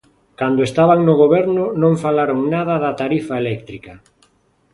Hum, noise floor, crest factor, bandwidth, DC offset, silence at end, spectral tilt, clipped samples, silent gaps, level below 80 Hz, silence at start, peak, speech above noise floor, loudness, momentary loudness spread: none; -59 dBFS; 16 dB; 11.5 kHz; under 0.1%; 0.75 s; -8 dB/octave; under 0.1%; none; -54 dBFS; 0.4 s; 0 dBFS; 43 dB; -16 LUFS; 11 LU